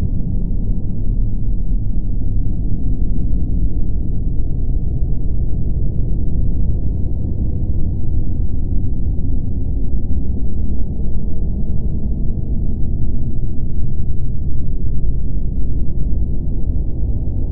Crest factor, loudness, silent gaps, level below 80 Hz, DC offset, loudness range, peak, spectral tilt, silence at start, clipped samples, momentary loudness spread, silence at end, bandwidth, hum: 10 dB; -23 LUFS; none; -18 dBFS; under 0.1%; 2 LU; -2 dBFS; -15 dB/octave; 0 s; under 0.1%; 2 LU; 0 s; 0.9 kHz; none